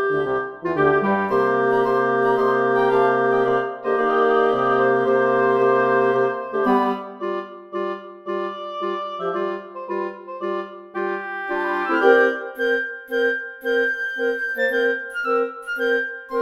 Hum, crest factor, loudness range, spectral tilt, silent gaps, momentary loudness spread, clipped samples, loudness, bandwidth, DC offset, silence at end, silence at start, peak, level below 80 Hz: none; 18 dB; 9 LU; -6.5 dB/octave; none; 10 LU; under 0.1%; -21 LUFS; 12.5 kHz; under 0.1%; 0 s; 0 s; -2 dBFS; -60 dBFS